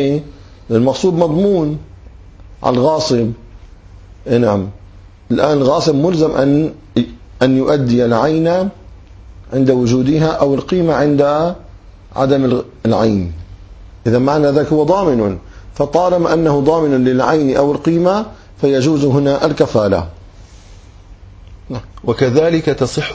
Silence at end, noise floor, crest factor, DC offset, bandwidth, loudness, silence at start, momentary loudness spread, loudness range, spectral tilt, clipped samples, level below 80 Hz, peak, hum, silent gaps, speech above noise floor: 0 s; -38 dBFS; 14 dB; under 0.1%; 8 kHz; -14 LUFS; 0 s; 10 LU; 4 LU; -7 dB/octave; under 0.1%; -38 dBFS; 0 dBFS; none; none; 25 dB